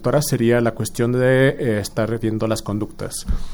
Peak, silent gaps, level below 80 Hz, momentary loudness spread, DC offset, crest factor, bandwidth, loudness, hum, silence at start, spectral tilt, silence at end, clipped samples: -2 dBFS; none; -32 dBFS; 10 LU; under 0.1%; 16 dB; over 20 kHz; -20 LUFS; none; 0 s; -6 dB/octave; 0 s; under 0.1%